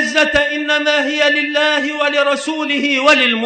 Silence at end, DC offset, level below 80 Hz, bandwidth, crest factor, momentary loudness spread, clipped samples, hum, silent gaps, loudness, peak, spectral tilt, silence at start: 0 s; under 0.1%; -48 dBFS; 9.2 kHz; 14 dB; 6 LU; under 0.1%; none; none; -14 LUFS; 0 dBFS; -2 dB/octave; 0 s